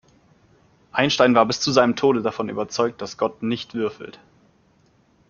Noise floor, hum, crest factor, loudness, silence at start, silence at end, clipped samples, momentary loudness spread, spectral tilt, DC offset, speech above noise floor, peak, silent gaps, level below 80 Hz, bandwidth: -59 dBFS; none; 22 dB; -21 LUFS; 0.95 s; 1.2 s; under 0.1%; 11 LU; -4.5 dB/octave; under 0.1%; 39 dB; -2 dBFS; none; -62 dBFS; 7.2 kHz